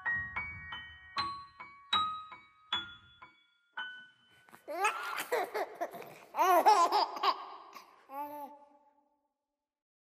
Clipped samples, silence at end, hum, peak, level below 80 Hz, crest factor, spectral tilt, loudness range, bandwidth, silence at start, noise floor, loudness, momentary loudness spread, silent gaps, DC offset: under 0.1%; 1.5 s; none; -12 dBFS; -70 dBFS; 24 dB; -2 dB/octave; 8 LU; 15.5 kHz; 0 s; under -90 dBFS; -33 LUFS; 24 LU; none; under 0.1%